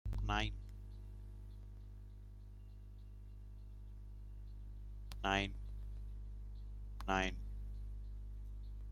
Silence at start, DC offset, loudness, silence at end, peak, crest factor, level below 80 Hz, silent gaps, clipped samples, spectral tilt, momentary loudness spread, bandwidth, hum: 0.05 s; under 0.1%; -45 LUFS; 0 s; -20 dBFS; 24 dB; -48 dBFS; none; under 0.1%; -5 dB/octave; 19 LU; 12 kHz; 50 Hz at -50 dBFS